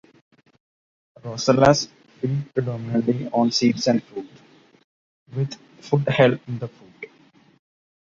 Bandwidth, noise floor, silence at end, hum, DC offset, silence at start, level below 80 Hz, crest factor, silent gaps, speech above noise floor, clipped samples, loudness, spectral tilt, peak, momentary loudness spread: 7.6 kHz; -55 dBFS; 1.15 s; none; under 0.1%; 1.25 s; -56 dBFS; 22 dB; 4.84-5.26 s; 34 dB; under 0.1%; -21 LUFS; -5.5 dB/octave; -2 dBFS; 22 LU